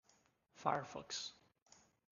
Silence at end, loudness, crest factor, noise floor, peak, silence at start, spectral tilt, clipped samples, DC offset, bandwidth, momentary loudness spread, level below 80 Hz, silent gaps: 0.8 s; -44 LUFS; 28 dB; -76 dBFS; -20 dBFS; 0.55 s; -3 dB/octave; under 0.1%; under 0.1%; 10 kHz; 6 LU; -82 dBFS; none